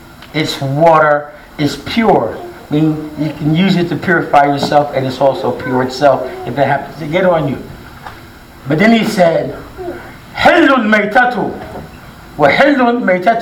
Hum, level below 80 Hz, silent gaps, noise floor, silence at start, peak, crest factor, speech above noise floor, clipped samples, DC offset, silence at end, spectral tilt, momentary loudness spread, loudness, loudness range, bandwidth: none; -42 dBFS; none; -35 dBFS; 0 s; 0 dBFS; 12 dB; 23 dB; 0.2%; under 0.1%; 0 s; -6 dB/octave; 18 LU; -12 LUFS; 3 LU; 18 kHz